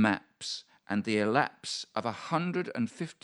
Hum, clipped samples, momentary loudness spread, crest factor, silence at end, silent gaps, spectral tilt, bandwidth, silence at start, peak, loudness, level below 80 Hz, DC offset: none; under 0.1%; 10 LU; 22 dB; 0.1 s; none; -5 dB/octave; 11.5 kHz; 0 s; -10 dBFS; -32 LUFS; -78 dBFS; under 0.1%